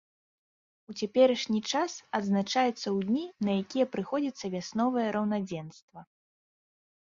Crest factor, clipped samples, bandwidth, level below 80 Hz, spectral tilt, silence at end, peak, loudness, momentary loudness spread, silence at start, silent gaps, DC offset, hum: 20 dB; under 0.1%; 7.4 kHz; -72 dBFS; -5 dB/octave; 1 s; -10 dBFS; -30 LUFS; 12 LU; 0.9 s; 5.82-5.88 s; under 0.1%; none